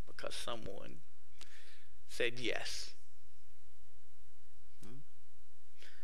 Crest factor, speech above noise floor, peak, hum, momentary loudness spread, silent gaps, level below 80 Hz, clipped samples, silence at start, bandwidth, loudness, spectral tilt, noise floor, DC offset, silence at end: 28 dB; 27 dB; -18 dBFS; none; 24 LU; none; -68 dBFS; under 0.1%; 0.05 s; 16 kHz; -42 LUFS; -3 dB/octave; -69 dBFS; 3%; 0 s